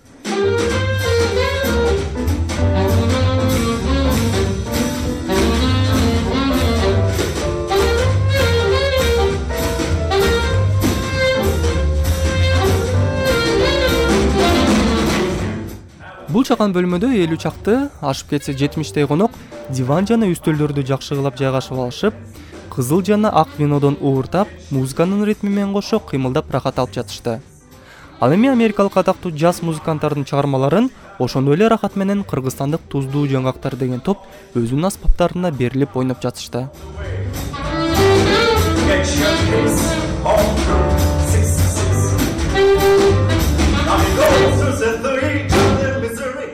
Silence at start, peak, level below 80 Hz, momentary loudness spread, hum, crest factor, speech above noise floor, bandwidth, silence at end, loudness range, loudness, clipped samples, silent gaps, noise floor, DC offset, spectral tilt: 0.25 s; 0 dBFS; -28 dBFS; 8 LU; none; 16 dB; 25 dB; 16.5 kHz; 0 s; 5 LU; -17 LUFS; under 0.1%; none; -42 dBFS; under 0.1%; -5.5 dB/octave